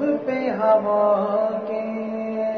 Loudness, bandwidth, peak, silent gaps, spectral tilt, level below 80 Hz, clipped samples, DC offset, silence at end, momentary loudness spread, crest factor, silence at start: -22 LUFS; 6.2 kHz; -6 dBFS; none; -8.5 dB/octave; -72 dBFS; under 0.1%; under 0.1%; 0 s; 9 LU; 14 dB; 0 s